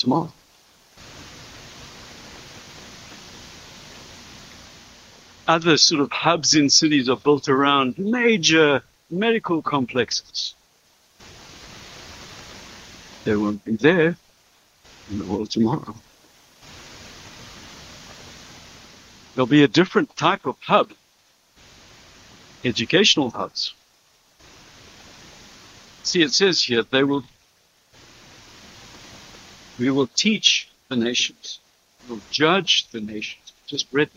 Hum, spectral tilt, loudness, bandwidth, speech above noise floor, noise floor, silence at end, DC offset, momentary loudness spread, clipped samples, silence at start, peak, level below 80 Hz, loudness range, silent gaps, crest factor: none; -3.5 dB/octave; -20 LUFS; 15 kHz; 40 dB; -60 dBFS; 0.1 s; under 0.1%; 25 LU; under 0.1%; 0 s; -2 dBFS; -58 dBFS; 18 LU; none; 22 dB